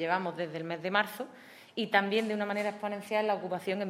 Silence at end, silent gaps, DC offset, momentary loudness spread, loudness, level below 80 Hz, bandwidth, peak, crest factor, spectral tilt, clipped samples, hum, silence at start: 0 s; none; under 0.1%; 12 LU; -32 LUFS; -88 dBFS; 16 kHz; -10 dBFS; 22 dB; -5 dB/octave; under 0.1%; none; 0 s